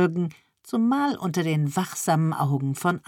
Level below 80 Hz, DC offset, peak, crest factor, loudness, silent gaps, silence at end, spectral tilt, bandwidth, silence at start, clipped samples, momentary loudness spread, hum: -72 dBFS; under 0.1%; -8 dBFS; 16 dB; -25 LUFS; none; 0.1 s; -6 dB/octave; 17.5 kHz; 0 s; under 0.1%; 5 LU; none